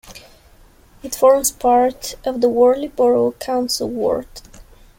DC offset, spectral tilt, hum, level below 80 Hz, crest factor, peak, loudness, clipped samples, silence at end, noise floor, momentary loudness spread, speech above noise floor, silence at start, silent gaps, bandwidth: under 0.1%; -3.5 dB/octave; none; -46 dBFS; 16 dB; -2 dBFS; -17 LUFS; under 0.1%; 0.35 s; -48 dBFS; 11 LU; 31 dB; 0.05 s; none; 17 kHz